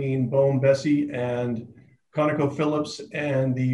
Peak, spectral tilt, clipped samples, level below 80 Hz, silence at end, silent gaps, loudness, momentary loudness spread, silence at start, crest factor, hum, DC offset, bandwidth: -8 dBFS; -7.5 dB/octave; under 0.1%; -64 dBFS; 0 s; none; -24 LUFS; 10 LU; 0 s; 16 dB; none; under 0.1%; 11 kHz